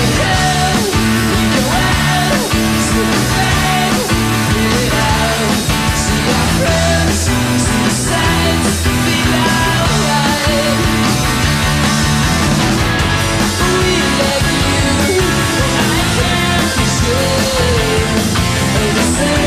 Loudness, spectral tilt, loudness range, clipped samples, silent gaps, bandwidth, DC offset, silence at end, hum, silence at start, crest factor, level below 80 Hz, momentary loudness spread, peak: -13 LUFS; -4 dB/octave; 0 LU; under 0.1%; none; 15.5 kHz; under 0.1%; 0 s; none; 0 s; 10 dB; -24 dBFS; 1 LU; -2 dBFS